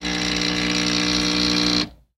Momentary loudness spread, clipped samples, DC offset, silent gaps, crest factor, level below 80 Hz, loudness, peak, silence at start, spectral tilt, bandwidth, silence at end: 3 LU; under 0.1%; under 0.1%; none; 16 dB; -40 dBFS; -19 LUFS; -6 dBFS; 0 s; -3 dB/octave; 16 kHz; 0.25 s